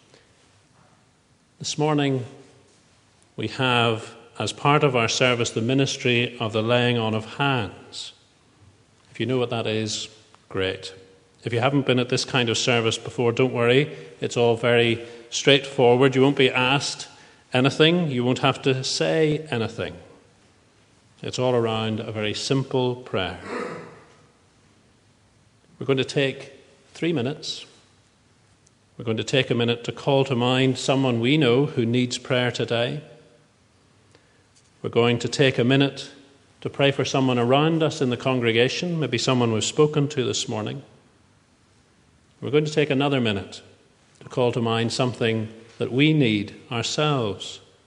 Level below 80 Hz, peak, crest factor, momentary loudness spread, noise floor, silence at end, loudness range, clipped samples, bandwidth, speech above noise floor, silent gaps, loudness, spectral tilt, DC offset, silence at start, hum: -64 dBFS; -2 dBFS; 22 dB; 14 LU; -60 dBFS; 0.3 s; 8 LU; under 0.1%; 10.5 kHz; 38 dB; none; -22 LUFS; -5 dB/octave; under 0.1%; 1.6 s; none